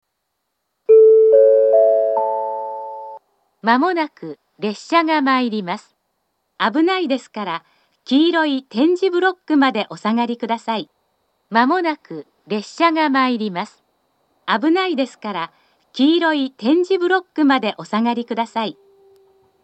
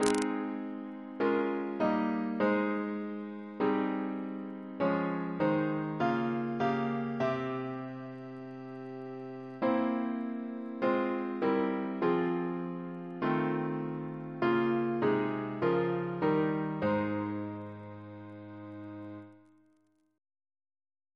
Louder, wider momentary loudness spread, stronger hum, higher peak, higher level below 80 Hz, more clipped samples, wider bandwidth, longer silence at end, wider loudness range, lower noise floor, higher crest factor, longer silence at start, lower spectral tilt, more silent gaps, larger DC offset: first, -17 LUFS vs -33 LUFS; about the same, 16 LU vs 14 LU; neither; first, 0 dBFS vs -8 dBFS; second, -82 dBFS vs -72 dBFS; neither; second, 8.4 kHz vs 11 kHz; second, 0.9 s vs 1.8 s; about the same, 6 LU vs 5 LU; about the same, -74 dBFS vs -71 dBFS; second, 18 dB vs 26 dB; first, 0.9 s vs 0 s; second, -5.5 dB/octave vs -7 dB/octave; neither; neither